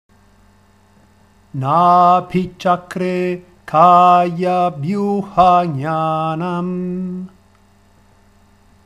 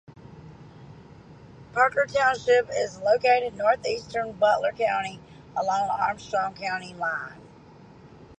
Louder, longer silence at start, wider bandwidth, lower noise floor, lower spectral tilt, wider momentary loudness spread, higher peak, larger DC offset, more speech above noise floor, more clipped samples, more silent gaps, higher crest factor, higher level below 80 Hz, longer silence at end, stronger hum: first, -15 LUFS vs -25 LUFS; first, 1.55 s vs 0.1 s; first, 10.5 kHz vs 9 kHz; about the same, -51 dBFS vs -49 dBFS; first, -7.5 dB/octave vs -3.5 dB/octave; first, 14 LU vs 10 LU; first, 0 dBFS vs -8 dBFS; neither; first, 37 dB vs 25 dB; neither; neither; about the same, 16 dB vs 18 dB; first, -50 dBFS vs -60 dBFS; first, 1.6 s vs 0.05 s; neither